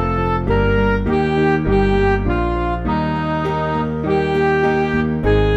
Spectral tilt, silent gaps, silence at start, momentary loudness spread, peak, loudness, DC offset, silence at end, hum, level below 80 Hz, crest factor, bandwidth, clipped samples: -8.5 dB/octave; none; 0 s; 4 LU; -4 dBFS; -17 LUFS; under 0.1%; 0 s; none; -26 dBFS; 12 dB; 8.2 kHz; under 0.1%